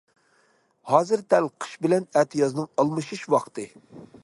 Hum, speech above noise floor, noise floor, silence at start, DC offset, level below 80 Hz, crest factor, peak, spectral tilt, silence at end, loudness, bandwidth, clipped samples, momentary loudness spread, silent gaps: none; 41 dB; -64 dBFS; 0.85 s; under 0.1%; -72 dBFS; 22 dB; -4 dBFS; -6 dB/octave; 0.2 s; -24 LUFS; 11.5 kHz; under 0.1%; 10 LU; none